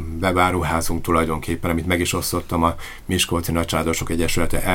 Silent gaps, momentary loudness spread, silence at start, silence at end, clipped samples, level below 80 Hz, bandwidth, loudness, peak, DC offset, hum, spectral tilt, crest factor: none; 5 LU; 0 s; 0 s; under 0.1%; -32 dBFS; 17 kHz; -21 LUFS; -2 dBFS; under 0.1%; none; -4.5 dB/octave; 18 dB